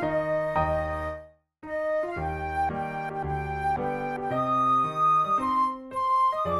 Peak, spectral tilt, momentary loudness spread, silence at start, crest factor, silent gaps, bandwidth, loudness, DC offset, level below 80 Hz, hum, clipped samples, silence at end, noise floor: -14 dBFS; -7 dB/octave; 9 LU; 0 s; 14 dB; none; 13.5 kHz; -27 LUFS; under 0.1%; -46 dBFS; none; under 0.1%; 0 s; -47 dBFS